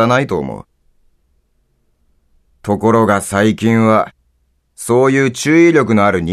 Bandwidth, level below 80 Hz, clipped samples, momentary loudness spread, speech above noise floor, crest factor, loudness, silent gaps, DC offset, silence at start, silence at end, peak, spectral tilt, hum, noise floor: 14 kHz; -48 dBFS; under 0.1%; 15 LU; 48 dB; 14 dB; -13 LUFS; none; under 0.1%; 0 s; 0 s; 0 dBFS; -6 dB/octave; none; -60 dBFS